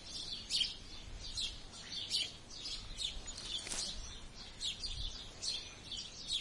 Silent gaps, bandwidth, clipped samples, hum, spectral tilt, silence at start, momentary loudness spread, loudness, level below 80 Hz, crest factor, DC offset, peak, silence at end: none; 11.5 kHz; under 0.1%; none; -0.5 dB/octave; 0 s; 12 LU; -40 LUFS; -52 dBFS; 20 dB; under 0.1%; -22 dBFS; 0 s